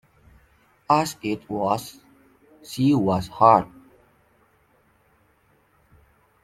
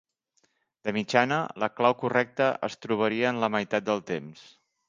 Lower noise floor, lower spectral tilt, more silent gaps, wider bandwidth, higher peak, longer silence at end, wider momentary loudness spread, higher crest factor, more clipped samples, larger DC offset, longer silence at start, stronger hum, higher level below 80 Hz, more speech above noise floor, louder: second, -62 dBFS vs -72 dBFS; about the same, -6.5 dB/octave vs -5.5 dB/octave; neither; first, 15.5 kHz vs 9 kHz; about the same, -2 dBFS vs -4 dBFS; first, 2.8 s vs 0.45 s; first, 17 LU vs 10 LU; about the same, 24 dB vs 24 dB; neither; neither; about the same, 0.9 s vs 0.85 s; neither; first, -58 dBFS vs -70 dBFS; second, 41 dB vs 45 dB; first, -21 LUFS vs -27 LUFS